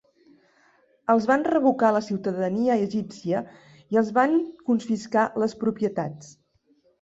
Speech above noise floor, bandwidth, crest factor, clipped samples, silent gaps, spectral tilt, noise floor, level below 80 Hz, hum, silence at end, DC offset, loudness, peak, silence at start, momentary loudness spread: 41 dB; 8 kHz; 18 dB; under 0.1%; none; -7 dB/octave; -64 dBFS; -66 dBFS; none; 0.7 s; under 0.1%; -24 LUFS; -8 dBFS; 1.1 s; 9 LU